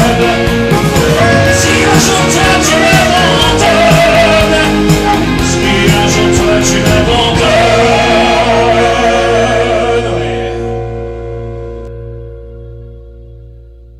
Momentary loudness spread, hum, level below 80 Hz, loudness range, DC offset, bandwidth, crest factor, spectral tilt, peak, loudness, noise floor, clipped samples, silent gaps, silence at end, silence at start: 15 LU; none; -24 dBFS; 11 LU; under 0.1%; 16 kHz; 10 dB; -4.5 dB/octave; 0 dBFS; -8 LUFS; -33 dBFS; 0.2%; none; 0.35 s; 0 s